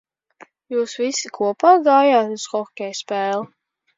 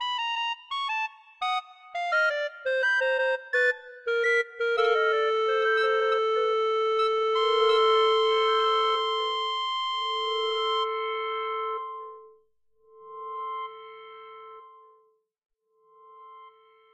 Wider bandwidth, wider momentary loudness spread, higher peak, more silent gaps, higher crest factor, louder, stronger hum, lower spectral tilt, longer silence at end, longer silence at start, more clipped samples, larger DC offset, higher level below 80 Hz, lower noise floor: second, 7.8 kHz vs 8.8 kHz; second, 13 LU vs 16 LU; first, -2 dBFS vs -12 dBFS; neither; about the same, 18 dB vs 16 dB; first, -19 LUFS vs -25 LUFS; neither; first, -3 dB/octave vs 1 dB/octave; about the same, 0.5 s vs 0.45 s; first, 0.7 s vs 0 s; neither; neither; about the same, -78 dBFS vs -80 dBFS; second, -50 dBFS vs -67 dBFS